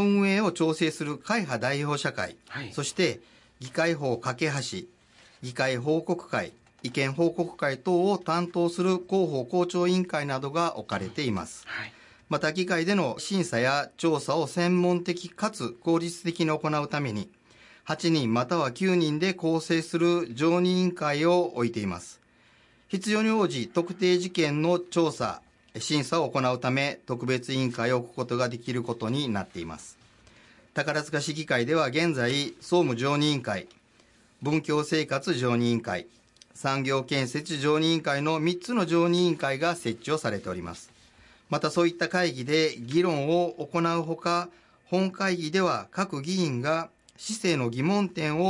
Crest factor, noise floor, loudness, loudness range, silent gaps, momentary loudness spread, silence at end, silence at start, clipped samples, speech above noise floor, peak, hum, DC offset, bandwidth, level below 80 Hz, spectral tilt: 14 dB; -60 dBFS; -27 LUFS; 4 LU; none; 10 LU; 0 s; 0 s; under 0.1%; 34 dB; -12 dBFS; none; under 0.1%; 11.5 kHz; -68 dBFS; -5.5 dB/octave